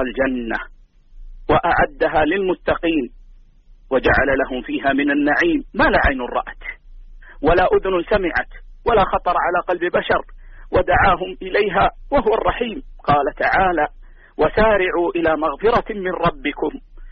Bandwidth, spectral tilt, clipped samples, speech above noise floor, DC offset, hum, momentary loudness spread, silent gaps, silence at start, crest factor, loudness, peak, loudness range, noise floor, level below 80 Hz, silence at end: 6.4 kHz; -3.5 dB/octave; under 0.1%; 28 dB; under 0.1%; none; 10 LU; none; 0 s; 14 dB; -18 LUFS; -4 dBFS; 2 LU; -46 dBFS; -34 dBFS; 0 s